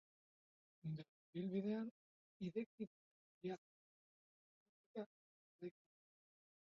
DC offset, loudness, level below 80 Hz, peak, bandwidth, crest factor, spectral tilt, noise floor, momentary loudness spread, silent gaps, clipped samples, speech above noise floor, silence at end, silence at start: under 0.1%; -50 LUFS; -90 dBFS; -32 dBFS; 6.8 kHz; 20 dB; -7.5 dB/octave; under -90 dBFS; 12 LU; 1.08-1.33 s, 1.91-2.40 s, 2.66-2.78 s, 2.87-3.41 s, 3.58-4.95 s, 5.06-5.59 s; under 0.1%; over 43 dB; 1.05 s; 0.85 s